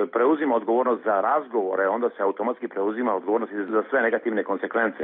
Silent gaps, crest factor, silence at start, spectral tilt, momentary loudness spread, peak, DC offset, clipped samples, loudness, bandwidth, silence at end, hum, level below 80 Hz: none; 14 dB; 0 s; -9.5 dB/octave; 5 LU; -10 dBFS; under 0.1%; under 0.1%; -24 LUFS; 3.9 kHz; 0 s; none; -80 dBFS